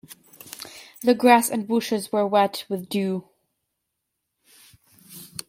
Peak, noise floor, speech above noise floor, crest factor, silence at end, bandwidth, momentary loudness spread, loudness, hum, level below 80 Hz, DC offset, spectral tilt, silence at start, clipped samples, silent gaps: -4 dBFS; -80 dBFS; 59 dB; 22 dB; 0.25 s; 16.5 kHz; 22 LU; -22 LUFS; none; -72 dBFS; under 0.1%; -4.5 dB/octave; 0.1 s; under 0.1%; none